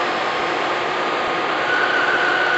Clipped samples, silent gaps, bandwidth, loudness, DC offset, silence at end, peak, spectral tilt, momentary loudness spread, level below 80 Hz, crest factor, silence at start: under 0.1%; none; 8.2 kHz; -19 LUFS; under 0.1%; 0 s; -6 dBFS; -3 dB/octave; 4 LU; -60 dBFS; 14 dB; 0 s